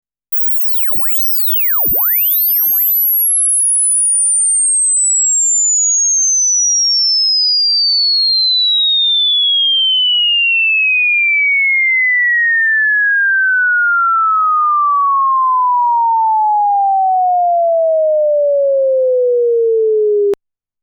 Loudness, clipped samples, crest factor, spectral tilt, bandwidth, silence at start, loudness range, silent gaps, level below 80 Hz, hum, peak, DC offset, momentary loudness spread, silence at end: -10 LUFS; under 0.1%; 4 dB; 3 dB/octave; over 20 kHz; 0.3 s; 3 LU; none; -56 dBFS; 50 Hz at -80 dBFS; -8 dBFS; under 0.1%; 4 LU; 0.5 s